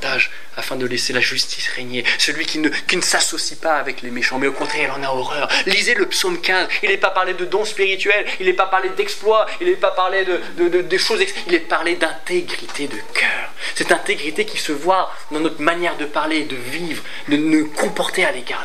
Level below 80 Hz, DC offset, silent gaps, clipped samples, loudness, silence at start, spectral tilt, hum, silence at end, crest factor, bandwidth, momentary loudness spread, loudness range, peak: -68 dBFS; 5%; none; under 0.1%; -18 LUFS; 0 s; -2 dB/octave; none; 0 s; 20 dB; 15.5 kHz; 7 LU; 3 LU; 0 dBFS